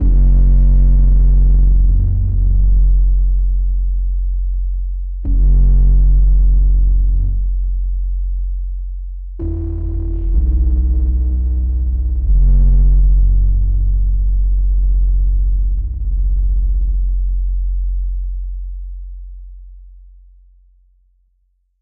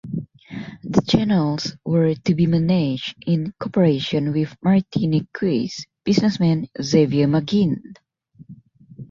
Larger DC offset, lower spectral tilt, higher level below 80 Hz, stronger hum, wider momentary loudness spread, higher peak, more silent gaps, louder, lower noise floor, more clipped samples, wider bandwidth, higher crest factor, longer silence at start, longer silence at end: first, 2% vs under 0.1%; first, -13.5 dB/octave vs -7 dB/octave; first, -12 dBFS vs -52 dBFS; neither; about the same, 12 LU vs 11 LU; about the same, -4 dBFS vs -2 dBFS; neither; first, -17 LUFS vs -20 LUFS; first, -61 dBFS vs -45 dBFS; neither; second, 0.8 kHz vs 7.4 kHz; second, 8 dB vs 18 dB; about the same, 0 s vs 0.05 s; about the same, 0 s vs 0.05 s